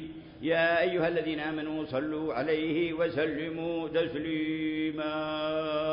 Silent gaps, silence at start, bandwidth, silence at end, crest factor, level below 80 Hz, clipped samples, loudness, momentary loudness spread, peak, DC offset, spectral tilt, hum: none; 0 s; 5.4 kHz; 0 s; 14 dB; -60 dBFS; under 0.1%; -30 LUFS; 7 LU; -16 dBFS; under 0.1%; -9.5 dB/octave; none